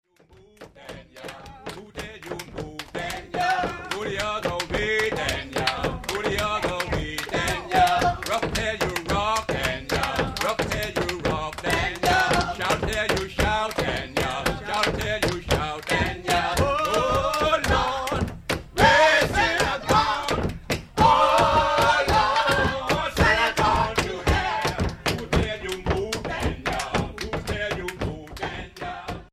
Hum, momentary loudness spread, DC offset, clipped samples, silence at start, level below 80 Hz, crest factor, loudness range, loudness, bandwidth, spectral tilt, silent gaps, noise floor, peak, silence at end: none; 13 LU; under 0.1%; under 0.1%; 0.6 s; -38 dBFS; 20 dB; 8 LU; -23 LUFS; 16 kHz; -4 dB/octave; none; -54 dBFS; -4 dBFS; 0.1 s